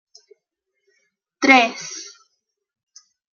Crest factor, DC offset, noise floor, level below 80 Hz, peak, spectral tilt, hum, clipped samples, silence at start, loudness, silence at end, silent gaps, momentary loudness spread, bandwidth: 22 dB; under 0.1%; -77 dBFS; -72 dBFS; -2 dBFS; -1.5 dB/octave; none; under 0.1%; 1.4 s; -16 LUFS; 1.3 s; none; 22 LU; 7.2 kHz